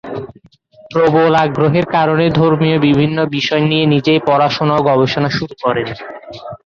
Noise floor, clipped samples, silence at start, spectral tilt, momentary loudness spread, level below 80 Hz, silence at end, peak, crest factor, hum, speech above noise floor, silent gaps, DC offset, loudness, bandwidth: -46 dBFS; under 0.1%; 0.05 s; -7 dB/octave; 15 LU; -48 dBFS; 0.1 s; -2 dBFS; 12 dB; none; 33 dB; none; under 0.1%; -13 LUFS; 7 kHz